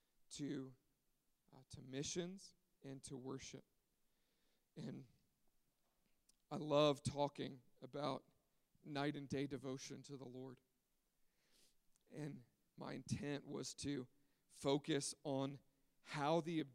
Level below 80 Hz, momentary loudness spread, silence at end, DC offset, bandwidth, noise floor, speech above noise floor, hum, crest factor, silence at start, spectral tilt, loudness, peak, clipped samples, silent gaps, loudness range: -78 dBFS; 19 LU; 0 s; under 0.1%; 15.5 kHz; -85 dBFS; 40 dB; none; 24 dB; 0.3 s; -5 dB/octave; -46 LUFS; -22 dBFS; under 0.1%; none; 13 LU